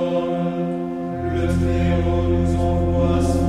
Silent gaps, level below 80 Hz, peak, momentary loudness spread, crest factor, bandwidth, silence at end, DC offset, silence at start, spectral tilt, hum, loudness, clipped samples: none; -30 dBFS; -8 dBFS; 6 LU; 12 dB; 11 kHz; 0 s; under 0.1%; 0 s; -8 dB/octave; none; -21 LUFS; under 0.1%